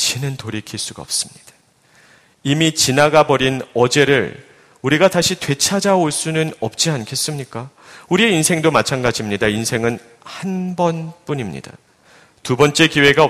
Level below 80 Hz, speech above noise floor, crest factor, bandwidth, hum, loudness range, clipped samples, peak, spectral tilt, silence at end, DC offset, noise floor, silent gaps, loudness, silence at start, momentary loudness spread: -50 dBFS; 36 dB; 18 dB; 15.5 kHz; none; 6 LU; under 0.1%; 0 dBFS; -4 dB/octave; 0 s; under 0.1%; -53 dBFS; none; -17 LUFS; 0 s; 15 LU